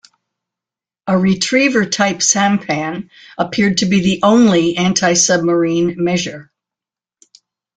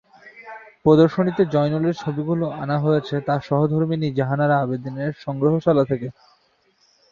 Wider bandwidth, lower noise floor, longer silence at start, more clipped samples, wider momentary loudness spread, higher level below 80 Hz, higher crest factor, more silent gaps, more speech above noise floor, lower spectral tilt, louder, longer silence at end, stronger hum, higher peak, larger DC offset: first, 9.6 kHz vs 7 kHz; first, -88 dBFS vs -62 dBFS; first, 1.05 s vs 0.25 s; neither; about the same, 10 LU vs 10 LU; about the same, -52 dBFS vs -56 dBFS; about the same, 16 dB vs 18 dB; neither; first, 73 dB vs 42 dB; second, -4 dB/octave vs -9 dB/octave; first, -14 LUFS vs -21 LUFS; first, 1.35 s vs 1 s; neither; about the same, 0 dBFS vs -2 dBFS; neither